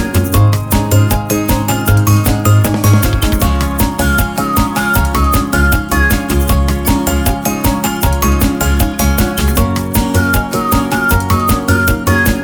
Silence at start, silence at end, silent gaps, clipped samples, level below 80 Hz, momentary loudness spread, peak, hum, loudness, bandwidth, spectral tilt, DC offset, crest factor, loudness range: 0 s; 0 s; none; under 0.1%; -18 dBFS; 3 LU; 0 dBFS; none; -13 LUFS; over 20 kHz; -5 dB/octave; under 0.1%; 12 dB; 2 LU